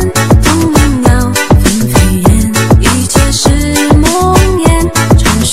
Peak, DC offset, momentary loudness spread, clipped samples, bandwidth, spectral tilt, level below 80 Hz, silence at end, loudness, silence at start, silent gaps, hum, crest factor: 0 dBFS; 4%; 2 LU; 2%; 16.5 kHz; -5 dB/octave; -14 dBFS; 0 s; -8 LUFS; 0 s; none; none; 8 dB